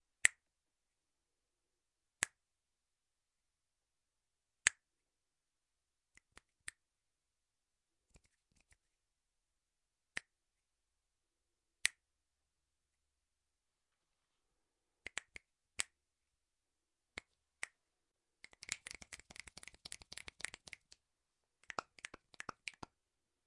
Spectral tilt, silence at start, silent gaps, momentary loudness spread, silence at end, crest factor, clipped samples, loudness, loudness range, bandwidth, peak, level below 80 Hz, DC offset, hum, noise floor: 1 dB/octave; 0.25 s; none; 20 LU; 0.75 s; 46 dB; under 0.1%; -43 LUFS; 17 LU; 11.5 kHz; -6 dBFS; -78 dBFS; under 0.1%; none; under -90 dBFS